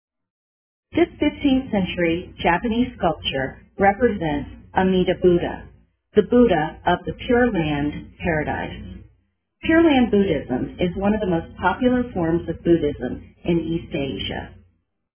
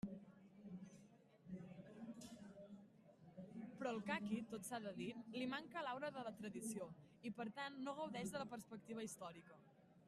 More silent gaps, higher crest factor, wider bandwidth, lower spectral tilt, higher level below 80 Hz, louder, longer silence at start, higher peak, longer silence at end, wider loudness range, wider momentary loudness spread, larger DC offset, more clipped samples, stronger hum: neither; about the same, 20 dB vs 20 dB; second, 3.5 kHz vs 13.5 kHz; first, -10.5 dB/octave vs -4.5 dB/octave; first, -40 dBFS vs -84 dBFS; first, -21 LUFS vs -51 LUFS; first, 0.95 s vs 0.05 s; first, -2 dBFS vs -30 dBFS; first, 0.65 s vs 0 s; second, 3 LU vs 10 LU; second, 11 LU vs 16 LU; neither; neither; neither